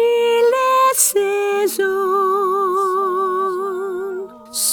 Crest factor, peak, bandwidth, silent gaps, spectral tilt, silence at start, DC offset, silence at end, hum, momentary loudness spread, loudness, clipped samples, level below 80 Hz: 16 dB; -2 dBFS; over 20 kHz; none; -1 dB/octave; 0 s; under 0.1%; 0 s; none; 10 LU; -17 LUFS; under 0.1%; -64 dBFS